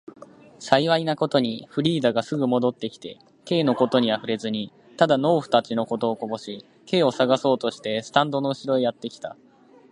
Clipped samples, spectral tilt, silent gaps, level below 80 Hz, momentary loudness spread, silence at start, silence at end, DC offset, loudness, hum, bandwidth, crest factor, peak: under 0.1%; -6 dB/octave; none; -68 dBFS; 15 LU; 0.6 s; 0.6 s; under 0.1%; -23 LUFS; none; 11 kHz; 24 dB; 0 dBFS